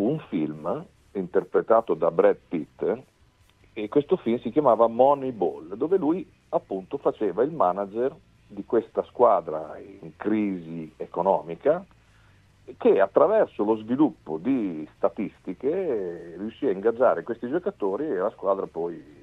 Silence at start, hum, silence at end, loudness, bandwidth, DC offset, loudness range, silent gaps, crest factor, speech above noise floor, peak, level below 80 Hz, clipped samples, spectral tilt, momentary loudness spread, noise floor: 0 s; none; 0.2 s; -25 LUFS; 5.8 kHz; under 0.1%; 3 LU; none; 20 dB; 35 dB; -4 dBFS; -64 dBFS; under 0.1%; -9 dB/octave; 13 LU; -60 dBFS